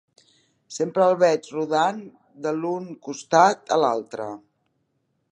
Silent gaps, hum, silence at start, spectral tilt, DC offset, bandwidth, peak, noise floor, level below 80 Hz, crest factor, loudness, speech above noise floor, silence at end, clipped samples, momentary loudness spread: none; none; 0.7 s; -4.5 dB/octave; under 0.1%; 10.5 kHz; -2 dBFS; -72 dBFS; -78 dBFS; 22 dB; -22 LUFS; 50 dB; 0.95 s; under 0.1%; 17 LU